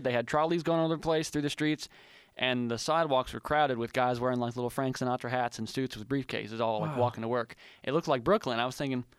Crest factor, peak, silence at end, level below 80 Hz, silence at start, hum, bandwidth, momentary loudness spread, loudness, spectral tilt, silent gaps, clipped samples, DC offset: 18 dB; -12 dBFS; 0.15 s; -60 dBFS; 0 s; none; 15.5 kHz; 7 LU; -31 LUFS; -5.5 dB/octave; none; under 0.1%; under 0.1%